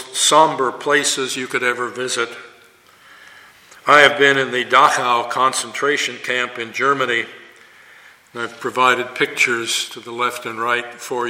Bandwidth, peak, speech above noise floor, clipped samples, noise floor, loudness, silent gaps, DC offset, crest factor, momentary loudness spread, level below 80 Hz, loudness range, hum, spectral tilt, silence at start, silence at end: 16.5 kHz; 0 dBFS; 31 dB; under 0.1%; -49 dBFS; -17 LUFS; none; under 0.1%; 18 dB; 13 LU; -68 dBFS; 6 LU; none; -1.5 dB/octave; 0 s; 0 s